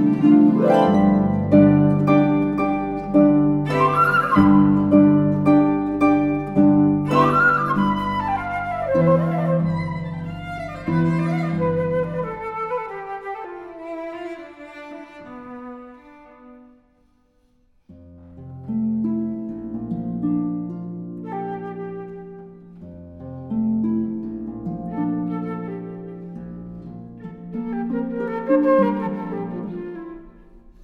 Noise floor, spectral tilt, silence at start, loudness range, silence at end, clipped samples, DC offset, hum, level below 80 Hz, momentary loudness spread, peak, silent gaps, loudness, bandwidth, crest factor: -60 dBFS; -9 dB/octave; 0 s; 15 LU; 0.25 s; under 0.1%; under 0.1%; none; -48 dBFS; 21 LU; -2 dBFS; none; -20 LUFS; 6.4 kHz; 18 dB